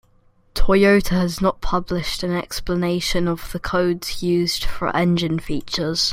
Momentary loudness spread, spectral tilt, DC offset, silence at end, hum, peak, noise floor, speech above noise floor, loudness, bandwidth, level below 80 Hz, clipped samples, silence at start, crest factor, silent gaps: 9 LU; -5 dB/octave; under 0.1%; 0 s; none; -2 dBFS; -56 dBFS; 37 dB; -21 LUFS; 16 kHz; -32 dBFS; under 0.1%; 0.55 s; 18 dB; none